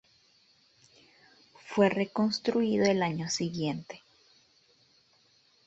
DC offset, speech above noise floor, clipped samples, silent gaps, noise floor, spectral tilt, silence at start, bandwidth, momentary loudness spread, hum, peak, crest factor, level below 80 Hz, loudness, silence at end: under 0.1%; 38 dB; under 0.1%; none; -66 dBFS; -5 dB/octave; 1.65 s; 8.2 kHz; 12 LU; none; -12 dBFS; 20 dB; -70 dBFS; -29 LUFS; 1.7 s